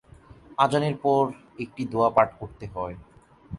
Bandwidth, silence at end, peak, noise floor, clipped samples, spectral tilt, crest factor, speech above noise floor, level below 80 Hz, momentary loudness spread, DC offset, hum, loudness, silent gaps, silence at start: 11.5 kHz; 0 s; -6 dBFS; -50 dBFS; under 0.1%; -6.5 dB/octave; 22 dB; 25 dB; -54 dBFS; 16 LU; under 0.1%; none; -25 LUFS; none; 0.5 s